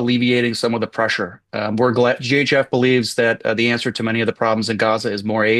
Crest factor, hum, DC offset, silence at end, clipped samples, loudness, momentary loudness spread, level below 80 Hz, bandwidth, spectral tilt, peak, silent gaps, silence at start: 14 dB; none; under 0.1%; 0 s; under 0.1%; -18 LUFS; 5 LU; -62 dBFS; 12.5 kHz; -5 dB/octave; -4 dBFS; none; 0 s